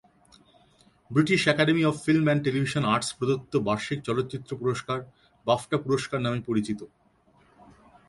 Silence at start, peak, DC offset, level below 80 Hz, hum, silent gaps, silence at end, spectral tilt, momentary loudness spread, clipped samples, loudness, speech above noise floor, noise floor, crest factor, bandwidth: 1.1 s; -6 dBFS; under 0.1%; -60 dBFS; none; none; 1.25 s; -5.5 dB/octave; 10 LU; under 0.1%; -26 LUFS; 36 dB; -62 dBFS; 22 dB; 11.5 kHz